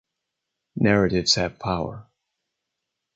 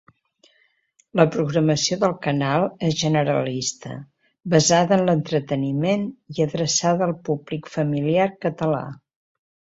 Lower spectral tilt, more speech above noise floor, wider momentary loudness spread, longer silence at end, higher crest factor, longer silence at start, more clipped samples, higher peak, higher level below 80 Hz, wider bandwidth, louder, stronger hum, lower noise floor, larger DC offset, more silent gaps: about the same, -4.5 dB/octave vs -5 dB/octave; first, 60 dB vs 43 dB; first, 12 LU vs 9 LU; first, 1.15 s vs 0.8 s; about the same, 22 dB vs 20 dB; second, 0.75 s vs 1.15 s; neither; about the same, -4 dBFS vs -2 dBFS; first, -48 dBFS vs -60 dBFS; first, 9.2 kHz vs 8 kHz; about the same, -22 LUFS vs -21 LUFS; neither; first, -82 dBFS vs -64 dBFS; neither; neither